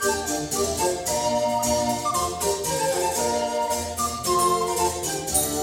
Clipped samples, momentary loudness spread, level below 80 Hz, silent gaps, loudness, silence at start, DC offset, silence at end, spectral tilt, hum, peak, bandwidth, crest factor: under 0.1%; 4 LU; -46 dBFS; none; -23 LUFS; 0 s; under 0.1%; 0 s; -2.5 dB/octave; none; -6 dBFS; 18 kHz; 18 dB